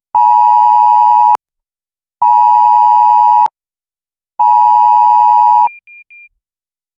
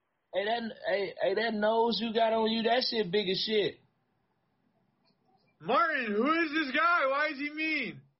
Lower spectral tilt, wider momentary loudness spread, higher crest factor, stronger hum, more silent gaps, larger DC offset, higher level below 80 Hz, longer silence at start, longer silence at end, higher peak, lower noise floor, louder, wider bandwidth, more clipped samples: about the same, -1.5 dB/octave vs -1.5 dB/octave; about the same, 5 LU vs 6 LU; about the same, 10 dB vs 14 dB; neither; neither; neither; first, -68 dBFS vs -74 dBFS; second, 0.15 s vs 0.35 s; first, 1.3 s vs 0.2 s; first, 0 dBFS vs -16 dBFS; first, under -90 dBFS vs -76 dBFS; first, -8 LUFS vs -29 LUFS; first, 7.2 kHz vs 6 kHz; neither